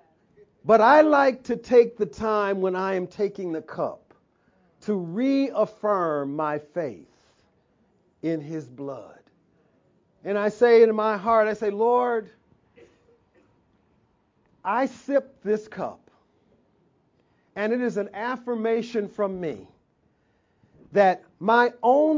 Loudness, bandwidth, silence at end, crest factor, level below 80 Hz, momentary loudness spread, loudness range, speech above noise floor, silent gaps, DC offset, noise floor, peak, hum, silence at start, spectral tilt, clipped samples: -23 LUFS; 7.6 kHz; 0 s; 20 dB; -66 dBFS; 16 LU; 9 LU; 44 dB; none; under 0.1%; -67 dBFS; -4 dBFS; none; 0.65 s; -6.5 dB/octave; under 0.1%